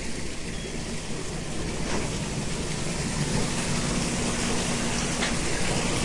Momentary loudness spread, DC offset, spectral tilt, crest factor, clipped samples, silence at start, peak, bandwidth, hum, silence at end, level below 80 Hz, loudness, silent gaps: 7 LU; under 0.1%; -3.5 dB/octave; 14 dB; under 0.1%; 0 s; -12 dBFS; 11.5 kHz; none; 0 s; -36 dBFS; -28 LUFS; none